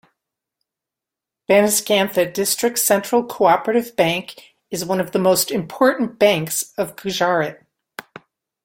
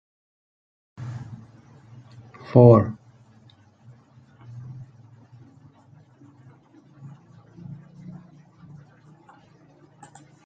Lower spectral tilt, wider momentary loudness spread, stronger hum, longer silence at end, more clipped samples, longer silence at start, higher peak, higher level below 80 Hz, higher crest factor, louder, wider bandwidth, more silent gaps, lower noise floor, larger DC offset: second, -3.5 dB/octave vs -11 dB/octave; second, 12 LU vs 32 LU; neither; second, 0.65 s vs 7.55 s; neither; first, 1.5 s vs 1 s; about the same, -2 dBFS vs -2 dBFS; about the same, -62 dBFS vs -64 dBFS; second, 18 dB vs 24 dB; about the same, -18 LUFS vs -17 LUFS; first, 17 kHz vs 7.2 kHz; neither; first, -86 dBFS vs -54 dBFS; neither